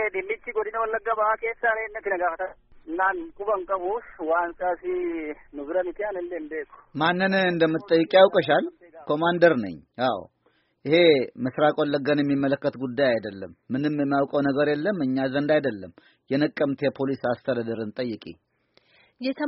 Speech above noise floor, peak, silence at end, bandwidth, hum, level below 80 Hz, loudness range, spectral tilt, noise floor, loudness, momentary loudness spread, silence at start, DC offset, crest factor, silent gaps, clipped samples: 43 dB; -4 dBFS; 0 s; 5.8 kHz; none; -60 dBFS; 6 LU; -4 dB/octave; -67 dBFS; -24 LUFS; 14 LU; 0 s; under 0.1%; 22 dB; none; under 0.1%